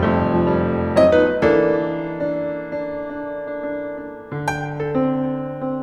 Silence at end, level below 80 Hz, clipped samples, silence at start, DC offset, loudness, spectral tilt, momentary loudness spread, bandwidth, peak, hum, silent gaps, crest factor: 0 s; -44 dBFS; under 0.1%; 0 s; under 0.1%; -20 LUFS; -7.5 dB/octave; 13 LU; 11 kHz; -2 dBFS; none; none; 18 dB